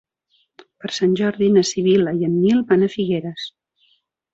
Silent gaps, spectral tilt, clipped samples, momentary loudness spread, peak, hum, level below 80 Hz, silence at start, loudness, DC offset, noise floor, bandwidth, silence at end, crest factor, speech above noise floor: none; -6 dB/octave; under 0.1%; 14 LU; -4 dBFS; none; -60 dBFS; 0.85 s; -18 LUFS; under 0.1%; -65 dBFS; 8 kHz; 0.85 s; 16 dB; 48 dB